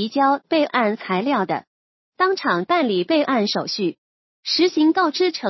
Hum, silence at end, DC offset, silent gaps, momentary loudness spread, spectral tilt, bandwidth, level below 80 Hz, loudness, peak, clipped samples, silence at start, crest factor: none; 0 s; under 0.1%; 1.67-2.12 s, 3.98-4.43 s; 7 LU; -5 dB/octave; 6.2 kHz; -76 dBFS; -20 LUFS; -4 dBFS; under 0.1%; 0 s; 16 dB